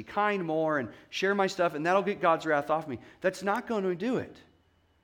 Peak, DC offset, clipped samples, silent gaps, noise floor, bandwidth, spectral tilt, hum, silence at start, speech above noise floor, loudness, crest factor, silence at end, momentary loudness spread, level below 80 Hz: -12 dBFS; under 0.1%; under 0.1%; none; -67 dBFS; 17.5 kHz; -5.5 dB/octave; none; 0 s; 38 dB; -29 LUFS; 18 dB; 0.65 s; 6 LU; -70 dBFS